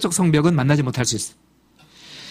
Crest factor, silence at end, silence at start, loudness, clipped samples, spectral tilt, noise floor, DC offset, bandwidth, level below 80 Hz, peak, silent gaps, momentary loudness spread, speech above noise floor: 20 dB; 0 s; 0 s; -19 LUFS; under 0.1%; -5 dB/octave; -54 dBFS; under 0.1%; 15.5 kHz; -52 dBFS; -2 dBFS; none; 18 LU; 36 dB